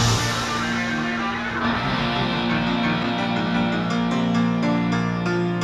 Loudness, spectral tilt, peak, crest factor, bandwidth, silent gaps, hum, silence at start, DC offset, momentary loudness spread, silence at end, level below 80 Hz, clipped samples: -22 LUFS; -5 dB/octave; -6 dBFS; 14 dB; 13.5 kHz; none; none; 0 s; under 0.1%; 3 LU; 0 s; -42 dBFS; under 0.1%